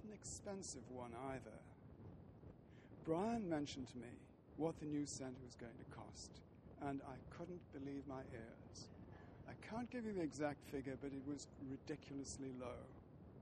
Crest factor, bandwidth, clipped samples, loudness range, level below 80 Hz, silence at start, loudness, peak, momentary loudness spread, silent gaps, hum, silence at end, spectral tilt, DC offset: 22 dB; 11 kHz; under 0.1%; 6 LU; -70 dBFS; 0 s; -50 LUFS; -28 dBFS; 16 LU; none; none; 0 s; -5.5 dB/octave; under 0.1%